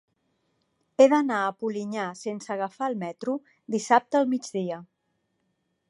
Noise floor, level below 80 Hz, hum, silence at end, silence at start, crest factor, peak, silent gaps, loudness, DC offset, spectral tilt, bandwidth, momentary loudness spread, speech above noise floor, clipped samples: -76 dBFS; -80 dBFS; none; 1.05 s; 1 s; 22 dB; -6 dBFS; none; -26 LUFS; under 0.1%; -5 dB/octave; 11.5 kHz; 14 LU; 50 dB; under 0.1%